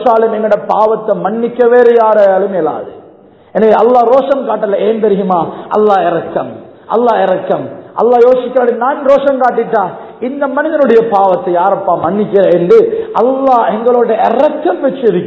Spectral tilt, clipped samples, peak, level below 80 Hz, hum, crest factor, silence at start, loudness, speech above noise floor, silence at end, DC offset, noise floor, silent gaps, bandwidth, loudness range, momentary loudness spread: -8 dB/octave; 0.9%; 0 dBFS; -54 dBFS; none; 10 dB; 0 s; -10 LUFS; 30 dB; 0 s; under 0.1%; -40 dBFS; none; 6.2 kHz; 2 LU; 9 LU